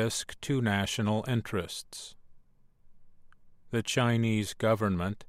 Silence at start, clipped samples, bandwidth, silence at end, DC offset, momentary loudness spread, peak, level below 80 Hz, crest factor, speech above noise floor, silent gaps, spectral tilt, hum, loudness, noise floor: 0 s; under 0.1%; 15.5 kHz; 0.05 s; under 0.1%; 12 LU; -12 dBFS; -58 dBFS; 18 dB; 28 dB; none; -5 dB/octave; none; -30 LUFS; -58 dBFS